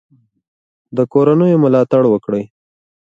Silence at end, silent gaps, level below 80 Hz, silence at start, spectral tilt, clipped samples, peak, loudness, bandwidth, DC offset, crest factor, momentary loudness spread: 0.6 s; none; -60 dBFS; 0.95 s; -10 dB/octave; under 0.1%; 0 dBFS; -14 LUFS; 7.4 kHz; under 0.1%; 14 dB; 11 LU